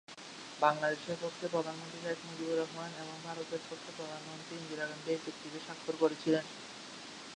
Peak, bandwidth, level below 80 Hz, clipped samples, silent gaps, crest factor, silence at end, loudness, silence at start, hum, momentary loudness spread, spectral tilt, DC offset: -12 dBFS; 11 kHz; -82 dBFS; under 0.1%; none; 24 dB; 0 s; -38 LUFS; 0.1 s; none; 14 LU; -4 dB/octave; under 0.1%